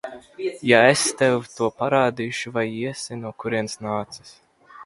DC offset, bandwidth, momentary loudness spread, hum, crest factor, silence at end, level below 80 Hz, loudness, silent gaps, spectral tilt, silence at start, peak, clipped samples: under 0.1%; 11.5 kHz; 16 LU; none; 22 dB; 0 s; -62 dBFS; -22 LUFS; none; -4 dB/octave; 0.05 s; 0 dBFS; under 0.1%